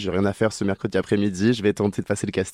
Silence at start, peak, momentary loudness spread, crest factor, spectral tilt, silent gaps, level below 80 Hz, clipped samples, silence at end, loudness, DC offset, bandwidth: 0 s; -8 dBFS; 5 LU; 14 dB; -6 dB/octave; none; -56 dBFS; under 0.1%; 0 s; -23 LUFS; under 0.1%; 13 kHz